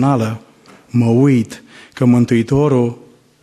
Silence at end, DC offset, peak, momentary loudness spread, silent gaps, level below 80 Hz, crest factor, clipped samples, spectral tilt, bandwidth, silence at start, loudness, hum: 0.5 s; under 0.1%; -2 dBFS; 13 LU; none; -48 dBFS; 12 dB; under 0.1%; -8 dB/octave; 12.5 kHz; 0 s; -15 LUFS; none